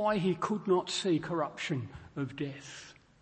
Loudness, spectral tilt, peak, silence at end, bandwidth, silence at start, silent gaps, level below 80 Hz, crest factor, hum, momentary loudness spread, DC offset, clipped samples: -33 LUFS; -5.5 dB/octave; -16 dBFS; 0.3 s; 8.8 kHz; 0 s; none; -64 dBFS; 16 dB; none; 16 LU; under 0.1%; under 0.1%